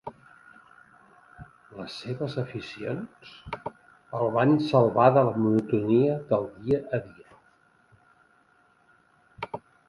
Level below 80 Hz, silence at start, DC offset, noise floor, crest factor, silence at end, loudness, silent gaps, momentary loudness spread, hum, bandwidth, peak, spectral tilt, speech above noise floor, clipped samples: -62 dBFS; 0.05 s; under 0.1%; -63 dBFS; 24 dB; 0.3 s; -25 LUFS; none; 21 LU; none; 11.5 kHz; -4 dBFS; -8.5 dB/octave; 38 dB; under 0.1%